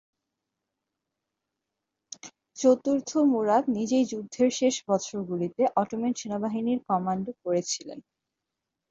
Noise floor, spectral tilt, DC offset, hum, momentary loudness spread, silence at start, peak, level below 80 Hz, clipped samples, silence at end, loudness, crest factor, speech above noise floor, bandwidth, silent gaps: -85 dBFS; -5 dB/octave; under 0.1%; none; 19 LU; 2.25 s; -8 dBFS; -72 dBFS; under 0.1%; 0.9 s; -27 LUFS; 20 dB; 60 dB; 7.8 kHz; none